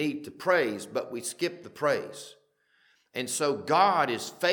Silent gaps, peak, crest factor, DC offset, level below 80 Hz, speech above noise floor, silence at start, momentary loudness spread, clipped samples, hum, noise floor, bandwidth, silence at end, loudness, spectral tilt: none; -8 dBFS; 20 dB; under 0.1%; -80 dBFS; 40 dB; 0 s; 14 LU; under 0.1%; none; -68 dBFS; 19 kHz; 0 s; -28 LUFS; -3.5 dB/octave